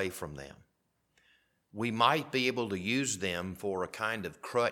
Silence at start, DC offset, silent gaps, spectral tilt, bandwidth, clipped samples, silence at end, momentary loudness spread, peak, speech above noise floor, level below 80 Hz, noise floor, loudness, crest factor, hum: 0 s; under 0.1%; none; -3.5 dB/octave; 18 kHz; under 0.1%; 0 s; 15 LU; -10 dBFS; 42 dB; -66 dBFS; -75 dBFS; -32 LUFS; 24 dB; none